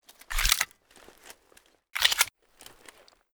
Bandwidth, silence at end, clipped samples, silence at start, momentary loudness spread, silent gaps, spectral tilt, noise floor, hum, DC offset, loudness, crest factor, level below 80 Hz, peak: over 20 kHz; 0.75 s; under 0.1%; 0.3 s; 14 LU; none; 1.5 dB/octave; -62 dBFS; none; under 0.1%; -26 LUFS; 28 dB; -42 dBFS; -4 dBFS